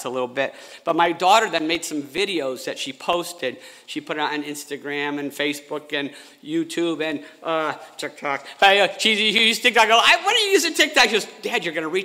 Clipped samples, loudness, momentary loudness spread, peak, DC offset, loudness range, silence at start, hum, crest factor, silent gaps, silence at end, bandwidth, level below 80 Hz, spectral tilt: under 0.1%; -20 LUFS; 15 LU; -2 dBFS; under 0.1%; 11 LU; 0 s; none; 18 dB; none; 0 s; 16 kHz; -66 dBFS; -2 dB/octave